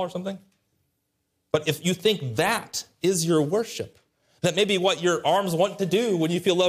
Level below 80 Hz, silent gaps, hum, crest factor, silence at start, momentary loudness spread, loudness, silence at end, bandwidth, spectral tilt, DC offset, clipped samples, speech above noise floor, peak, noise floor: -66 dBFS; none; none; 16 dB; 0 s; 11 LU; -24 LUFS; 0 s; 15.5 kHz; -4.5 dB/octave; under 0.1%; under 0.1%; 52 dB; -8 dBFS; -76 dBFS